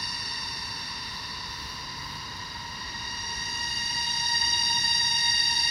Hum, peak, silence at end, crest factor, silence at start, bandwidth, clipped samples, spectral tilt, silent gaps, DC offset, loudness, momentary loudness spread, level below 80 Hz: none; -12 dBFS; 0 s; 18 dB; 0 s; 16 kHz; under 0.1%; 0 dB/octave; none; under 0.1%; -26 LUFS; 14 LU; -52 dBFS